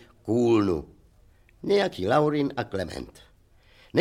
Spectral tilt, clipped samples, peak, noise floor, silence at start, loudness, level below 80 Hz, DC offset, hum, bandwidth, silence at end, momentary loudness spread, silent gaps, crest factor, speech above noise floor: -6.5 dB/octave; under 0.1%; -8 dBFS; -58 dBFS; 0.25 s; -25 LUFS; -52 dBFS; under 0.1%; none; 13 kHz; 0 s; 14 LU; none; 18 dB; 33 dB